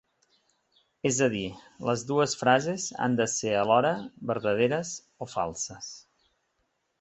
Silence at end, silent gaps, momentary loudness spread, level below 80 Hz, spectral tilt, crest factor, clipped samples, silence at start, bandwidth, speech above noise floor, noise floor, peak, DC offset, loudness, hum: 1 s; none; 14 LU; -64 dBFS; -4 dB/octave; 22 dB; under 0.1%; 1.05 s; 8.4 kHz; 49 dB; -76 dBFS; -6 dBFS; under 0.1%; -27 LUFS; none